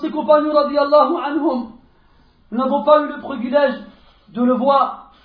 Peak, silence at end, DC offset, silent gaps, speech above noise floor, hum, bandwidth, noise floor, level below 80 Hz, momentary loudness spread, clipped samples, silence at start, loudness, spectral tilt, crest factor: 0 dBFS; 0.2 s; under 0.1%; none; 36 dB; none; 4.8 kHz; -52 dBFS; -56 dBFS; 12 LU; under 0.1%; 0 s; -17 LUFS; -8.5 dB/octave; 18 dB